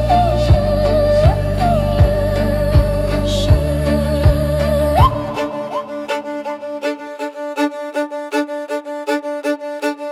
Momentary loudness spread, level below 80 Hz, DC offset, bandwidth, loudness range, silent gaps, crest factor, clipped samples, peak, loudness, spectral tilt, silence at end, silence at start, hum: 10 LU; -24 dBFS; under 0.1%; 15 kHz; 7 LU; none; 14 dB; under 0.1%; -2 dBFS; -17 LUFS; -7 dB/octave; 0 s; 0 s; none